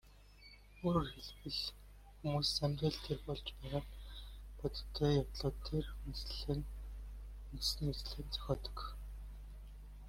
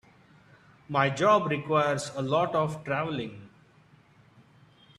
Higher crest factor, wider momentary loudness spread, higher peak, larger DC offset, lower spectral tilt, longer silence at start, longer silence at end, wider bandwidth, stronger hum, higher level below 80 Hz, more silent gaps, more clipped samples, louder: about the same, 20 dB vs 22 dB; first, 19 LU vs 9 LU; second, -22 dBFS vs -8 dBFS; neither; about the same, -5.5 dB/octave vs -5.5 dB/octave; second, 0.05 s vs 0.9 s; second, 0 s vs 1.5 s; first, 16.5 kHz vs 12.5 kHz; first, 50 Hz at -50 dBFS vs none; first, -48 dBFS vs -66 dBFS; neither; neither; second, -40 LUFS vs -27 LUFS